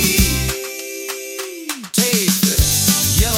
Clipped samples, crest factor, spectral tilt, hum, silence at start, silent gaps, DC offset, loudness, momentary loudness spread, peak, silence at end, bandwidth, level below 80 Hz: under 0.1%; 16 dB; -3 dB/octave; none; 0 s; none; under 0.1%; -16 LUFS; 13 LU; 0 dBFS; 0 s; 18 kHz; -26 dBFS